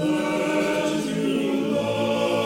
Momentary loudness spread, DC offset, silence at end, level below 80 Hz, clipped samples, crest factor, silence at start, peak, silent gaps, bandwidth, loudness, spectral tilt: 2 LU; under 0.1%; 0 s; -60 dBFS; under 0.1%; 12 dB; 0 s; -10 dBFS; none; 16.5 kHz; -23 LUFS; -5 dB/octave